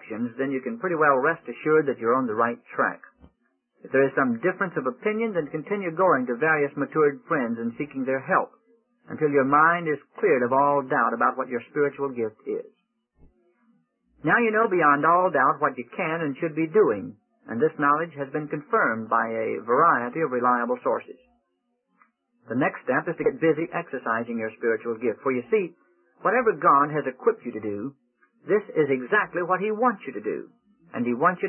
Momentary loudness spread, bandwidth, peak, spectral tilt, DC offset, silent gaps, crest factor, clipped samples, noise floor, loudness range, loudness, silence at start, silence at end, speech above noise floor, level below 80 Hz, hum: 11 LU; 3.2 kHz; -6 dBFS; -11 dB/octave; under 0.1%; none; 18 dB; under 0.1%; -75 dBFS; 4 LU; -24 LUFS; 0 s; 0 s; 51 dB; -72 dBFS; none